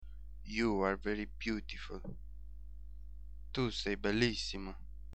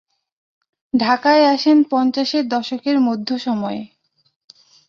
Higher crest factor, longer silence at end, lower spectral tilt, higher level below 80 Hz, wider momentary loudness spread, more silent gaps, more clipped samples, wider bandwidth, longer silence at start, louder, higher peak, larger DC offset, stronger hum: first, 22 dB vs 16 dB; second, 0 s vs 1 s; about the same, -5 dB/octave vs -5 dB/octave; first, -50 dBFS vs -66 dBFS; first, 21 LU vs 9 LU; neither; neither; first, 9 kHz vs 7.2 kHz; second, 0 s vs 0.95 s; second, -37 LUFS vs -17 LUFS; second, -16 dBFS vs -2 dBFS; first, 0.3% vs under 0.1%; first, 50 Hz at -50 dBFS vs none